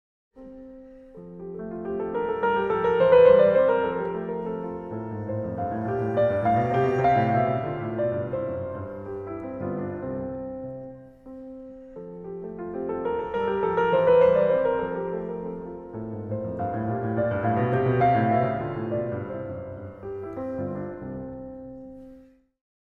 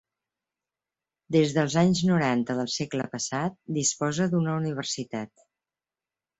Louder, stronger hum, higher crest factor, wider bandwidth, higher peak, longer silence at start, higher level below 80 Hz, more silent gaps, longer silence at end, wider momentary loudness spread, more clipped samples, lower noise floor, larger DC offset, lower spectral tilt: about the same, -25 LUFS vs -26 LUFS; neither; about the same, 20 dB vs 18 dB; second, 4.6 kHz vs 8.2 kHz; first, -6 dBFS vs -10 dBFS; second, 0.35 s vs 1.3 s; first, -52 dBFS vs -64 dBFS; neither; second, 0.65 s vs 1.15 s; first, 21 LU vs 8 LU; neither; second, -52 dBFS vs under -90 dBFS; neither; first, -9.5 dB/octave vs -5 dB/octave